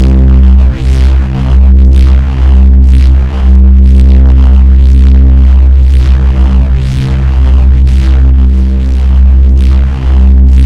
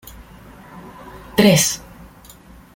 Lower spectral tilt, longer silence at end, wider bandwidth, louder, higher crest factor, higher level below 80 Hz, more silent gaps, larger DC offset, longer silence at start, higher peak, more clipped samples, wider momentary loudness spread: first, -8.5 dB/octave vs -4 dB/octave; second, 0 s vs 1 s; second, 4.4 kHz vs 17 kHz; first, -6 LUFS vs -16 LUFS; second, 4 dB vs 20 dB; first, -4 dBFS vs -46 dBFS; neither; first, 3% vs under 0.1%; second, 0 s vs 0.75 s; about the same, 0 dBFS vs 0 dBFS; first, 5% vs under 0.1%; second, 4 LU vs 26 LU